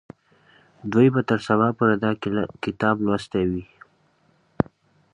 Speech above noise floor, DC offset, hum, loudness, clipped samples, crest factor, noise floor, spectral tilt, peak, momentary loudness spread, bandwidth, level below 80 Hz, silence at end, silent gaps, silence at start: 41 dB; under 0.1%; none; -22 LUFS; under 0.1%; 22 dB; -63 dBFS; -8 dB/octave; -2 dBFS; 9 LU; 10 kHz; -52 dBFS; 1.5 s; none; 0.85 s